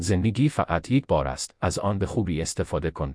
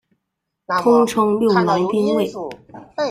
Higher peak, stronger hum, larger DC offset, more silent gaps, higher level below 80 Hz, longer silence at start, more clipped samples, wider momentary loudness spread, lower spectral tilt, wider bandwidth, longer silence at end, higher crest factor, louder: second, -8 dBFS vs -2 dBFS; neither; neither; neither; first, -40 dBFS vs -58 dBFS; second, 0 s vs 0.7 s; neither; second, 5 LU vs 17 LU; about the same, -6 dB/octave vs -6 dB/octave; second, 11 kHz vs 15.5 kHz; about the same, 0 s vs 0 s; about the same, 16 dB vs 16 dB; second, -25 LUFS vs -17 LUFS